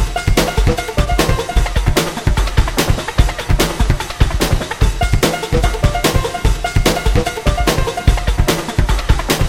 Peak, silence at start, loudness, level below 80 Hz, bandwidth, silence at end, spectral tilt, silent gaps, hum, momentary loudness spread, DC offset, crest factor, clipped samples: 0 dBFS; 0 s; -16 LUFS; -16 dBFS; 16.5 kHz; 0 s; -4.5 dB/octave; none; none; 3 LU; under 0.1%; 14 dB; under 0.1%